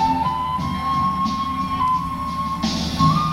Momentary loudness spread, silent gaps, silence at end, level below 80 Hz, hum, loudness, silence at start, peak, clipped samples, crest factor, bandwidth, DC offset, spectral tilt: 5 LU; none; 0 s; -40 dBFS; none; -21 LUFS; 0 s; -6 dBFS; under 0.1%; 16 dB; 15 kHz; under 0.1%; -5.5 dB/octave